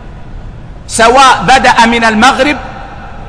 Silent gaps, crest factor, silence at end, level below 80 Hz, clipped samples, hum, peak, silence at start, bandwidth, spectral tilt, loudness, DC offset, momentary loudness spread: none; 8 dB; 0 s; -28 dBFS; 1%; none; 0 dBFS; 0 s; 11 kHz; -3 dB/octave; -6 LUFS; under 0.1%; 19 LU